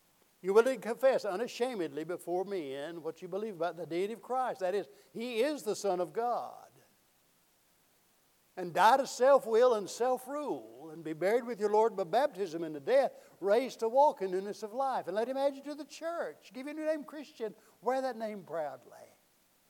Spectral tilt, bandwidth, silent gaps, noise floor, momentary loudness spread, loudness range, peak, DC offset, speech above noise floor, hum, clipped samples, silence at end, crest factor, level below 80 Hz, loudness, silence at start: -4.5 dB/octave; 18.5 kHz; none; -70 dBFS; 15 LU; 8 LU; -12 dBFS; under 0.1%; 37 dB; none; under 0.1%; 0.65 s; 20 dB; under -90 dBFS; -32 LUFS; 0.45 s